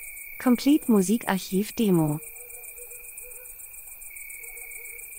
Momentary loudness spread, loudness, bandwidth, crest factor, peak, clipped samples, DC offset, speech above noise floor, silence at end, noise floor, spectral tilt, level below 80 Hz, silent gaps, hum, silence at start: 18 LU; -25 LUFS; 16 kHz; 18 dB; -8 dBFS; under 0.1%; under 0.1%; 20 dB; 0 s; -43 dBFS; -5.5 dB/octave; -56 dBFS; none; none; 0 s